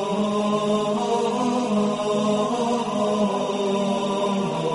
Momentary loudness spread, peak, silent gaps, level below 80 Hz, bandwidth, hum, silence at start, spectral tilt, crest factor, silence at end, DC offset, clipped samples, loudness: 1 LU; -10 dBFS; none; -60 dBFS; 11.5 kHz; none; 0 s; -5.5 dB/octave; 12 dB; 0 s; under 0.1%; under 0.1%; -23 LUFS